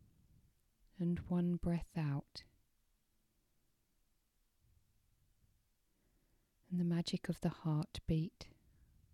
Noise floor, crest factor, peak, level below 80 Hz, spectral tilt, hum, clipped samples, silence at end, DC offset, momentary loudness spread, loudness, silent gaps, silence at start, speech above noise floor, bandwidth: -79 dBFS; 20 dB; -24 dBFS; -60 dBFS; -7.5 dB/octave; none; under 0.1%; 0.7 s; under 0.1%; 12 LU; -40 LUFS; none; 1 s; 40 dB; 12 kHz